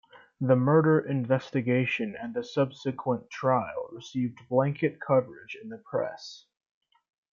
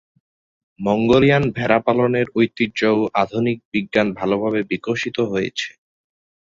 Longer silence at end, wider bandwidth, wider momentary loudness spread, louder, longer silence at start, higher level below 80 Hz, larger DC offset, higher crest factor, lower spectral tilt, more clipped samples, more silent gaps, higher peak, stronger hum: about the same, 0.95 s vs 0.85 s; about the same, 7.2 kHz vs 7.6 kHz; first, 15 LU vs 8 LU; second, -28 LUFS vs -19 LUFS; second, 0.15 s vs 0.8 s; second, -72 dBFS vs -52 dBFS; neither; about the same, 18 dB vs 18 dB; first, -8 dB/octave vs -6.5 dB/octave; neither; second, none vs 3.65-3.72 s; second, -10 dBFS vs -2 dBFS; neither